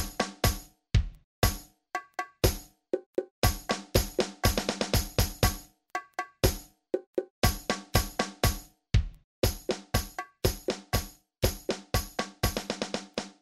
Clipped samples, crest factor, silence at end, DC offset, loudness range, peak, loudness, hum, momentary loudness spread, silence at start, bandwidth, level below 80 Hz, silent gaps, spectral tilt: under 0.1%; 24 dB; 0.1 s; under 0.1%; 3 LU; -8 dBFS; -31 LUFS; none; 11 LU; 0 s; 16 kHz; -36 dBFS; 1.24-1.42 s, 3.06-3.13 s, 3.31-3.42 s, 7.07-7.13 s, 7.30-7.42 s, 9.24-9.42 s; -4 dB/octave